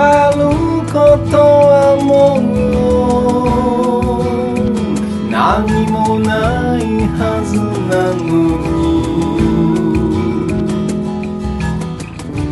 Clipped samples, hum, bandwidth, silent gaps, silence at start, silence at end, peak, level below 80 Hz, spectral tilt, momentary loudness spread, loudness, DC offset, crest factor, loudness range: under 0.1%; none; 11.5 kHz; none; 0 s; 0 s; 0 dBFS; -28 dBFS; -7 dB/octave; 9 LU; -13 LUFS; under 0.1%; 12 dB; 5 LU